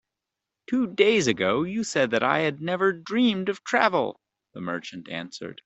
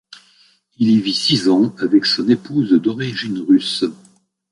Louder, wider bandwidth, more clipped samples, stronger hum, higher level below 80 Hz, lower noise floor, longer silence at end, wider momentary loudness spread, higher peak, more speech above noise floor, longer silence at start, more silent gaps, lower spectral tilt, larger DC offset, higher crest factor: second, -24 LUFS vs -16 LUFS; second, 8.2 kHz vs 11.5 kHz; neither; neither; second, -66 dBFS vs -60 dBFS; first, -86 dBFS vs -55 dBFS; second, 0.1 s vs 0.6 s; first, 13 LU vs 8 LU; about the same, -4 dBFS vs -2 dBFS; first, 61 dB vs 39 dB; about the same, 0.7 s vs 0.8 s; neither; about the same, -4.5 dB/octave vs -5.5 dB/octave; neither; first, 22 dB vs 16 dB